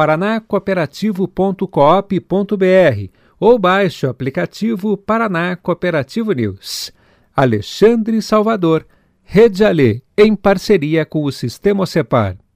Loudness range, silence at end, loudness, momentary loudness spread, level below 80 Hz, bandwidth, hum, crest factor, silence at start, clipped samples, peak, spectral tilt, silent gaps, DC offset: 5 LU; 0.2 s; -15 LUFS; 8 LU; -44 dBFS; 16 kHz; none; 14 dB; 0 s; under 0.1%; 0 dBFS; -6.5 dB/octave; none; under 0.1%